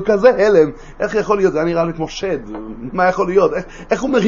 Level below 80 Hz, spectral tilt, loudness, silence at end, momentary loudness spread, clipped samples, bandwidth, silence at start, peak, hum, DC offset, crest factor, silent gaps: -38 dBFS; -6 dB/octave; -16 LUFS; 0 s; 12 LU; under 0.1%; 7.4 kHz; 0 s; 0 dBFS; none; under 0.1%; 16 dB; none